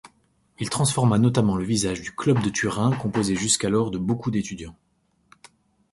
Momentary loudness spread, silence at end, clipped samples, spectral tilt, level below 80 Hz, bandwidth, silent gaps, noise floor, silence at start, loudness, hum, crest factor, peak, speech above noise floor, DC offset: 9 LU; 1.2 s; under 0.1%; -5 dB/octave; -50 dBFS; 11.5 kHz; none; -64 dBFS; 0.05 s; -23 LUFS; none; 18 dB; -6 dBFS; 41 dB; under 0.1%